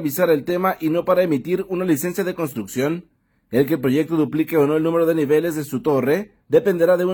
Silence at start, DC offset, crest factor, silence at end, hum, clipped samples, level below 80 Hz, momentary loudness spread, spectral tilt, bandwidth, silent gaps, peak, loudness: 0 s; under 0.1%; 16 dB; 0 s; none; under 0.1%; -60 dBFS; 6 LU; -6.5 dB/octave; 19 kHz; none; -2 dBFS; -20 LUFS